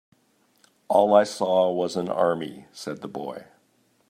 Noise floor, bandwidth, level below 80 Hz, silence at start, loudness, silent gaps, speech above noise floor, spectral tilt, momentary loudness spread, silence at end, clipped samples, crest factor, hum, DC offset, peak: -65 dBFS; 15 kHz; -74 dBFS; 0.9 s; -23 LUFS; none; 42 dB; -5.5 dB/octave; 18 LU; 0.65 s; under 0.1%; 20 dB; none; under 0.1%; -4 dBFS